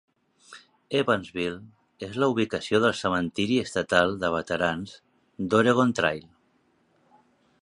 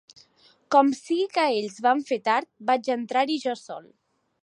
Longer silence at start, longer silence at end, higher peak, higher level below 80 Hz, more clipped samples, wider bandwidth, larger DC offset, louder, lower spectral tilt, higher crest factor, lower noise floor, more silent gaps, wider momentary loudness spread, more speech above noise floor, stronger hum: second, 0.5 s vs 0.7 s; first, 1.45 s vs 0.6 s; about the same, -4 dBFS vs -6 dBFS; first, -56 dBFS vs -82 dBFS; neither; about the same, 11 kHz vs 11 kHz; neither; about the same, -25 LUFS vs -24 LUFS; first, -5 dB/octave vs -3.5 dB/octave; about the same, 22 dB vs 20 dB; first, -67 dBFS vs -60 dBFS; neither; first, 13 LU vs 10 LU; first, 42 dB vs 36 dB; neither